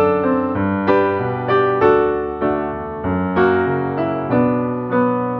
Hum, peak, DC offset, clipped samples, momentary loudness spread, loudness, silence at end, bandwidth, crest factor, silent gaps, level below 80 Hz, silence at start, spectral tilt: none; -2 dBFS; under 0.1%; under 0.1%; 7 LU; -18 LUFS; 0 s; 5.6 kHz; 14 dB; none; -46 dBFS; 0 s; -9.5 dB/octave